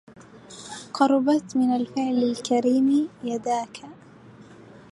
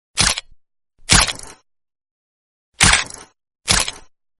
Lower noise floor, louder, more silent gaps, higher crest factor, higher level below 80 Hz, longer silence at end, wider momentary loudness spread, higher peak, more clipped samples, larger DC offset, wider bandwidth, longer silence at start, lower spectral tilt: second, -48 dBFS vs under -90 dBFS; second, -23 LUFS vs -15 LUFS; second, none vs 2.11-2.72 s; about the same, 18 dB vs 22 dB; second, -68 dBFS vs -34 dBFS; about the same, 0.35 s vs 0.4 s; about the same, 18 LU vs 19 LU; second, -6 dBFS vs 0 dBFS; neither; neither; second, 11.5 kHz vs over 20 kHz; about the same, 0.2 s vs 0.15 s; first, -5 dB/octave vs -1 dB/octave